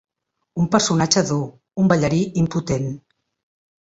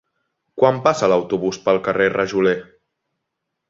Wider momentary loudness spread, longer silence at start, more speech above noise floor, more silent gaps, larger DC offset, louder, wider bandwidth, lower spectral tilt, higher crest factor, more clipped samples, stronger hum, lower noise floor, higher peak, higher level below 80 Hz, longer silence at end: first, 13 LU vs 6 LU; about the same, 0.55 s vs 0.55 s; second, 38 dB vs 61 dB; neither; neither; about the same, -20 LUFS vs -18 LUFS; about the same, 8 kHz vs 7.8 kHz; about the same, -5 dB/octave vs -5.5 dB/octave; about the same, 20 dB vs 18 dB; neither; neither; second, -56 dBFS vs -78 dBFS; about the same, -2 dBFS vs -2 dBFS; first, -48 dBFS vs -58 dBFS; second, 0.85 s vs 1.05 s